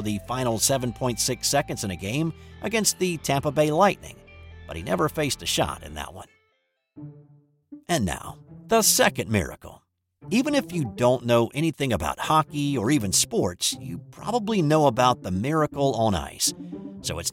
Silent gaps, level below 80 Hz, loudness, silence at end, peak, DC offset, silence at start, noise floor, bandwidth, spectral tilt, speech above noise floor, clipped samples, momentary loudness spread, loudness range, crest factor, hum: none; -48 dBFS; -24 LUFS; 0 s; -6 dBFS; under 0.1%; 0 s; -72 dBFS; 17 kHz; -4 dB/octave; 48 dB; under 0.1%; 16 LU; 6 LU; 18 dB; none